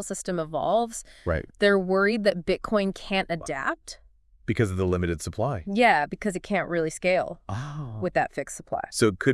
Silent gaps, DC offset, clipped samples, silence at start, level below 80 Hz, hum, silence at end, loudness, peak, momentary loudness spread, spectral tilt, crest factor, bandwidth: none; under 0.1%; under 0.1%; 0 s; -50 dBFS; none; 0 s; -26 LUFS; -6 dBFS; 12 LU; -5 dB/octave; 20 dB; 12 kHz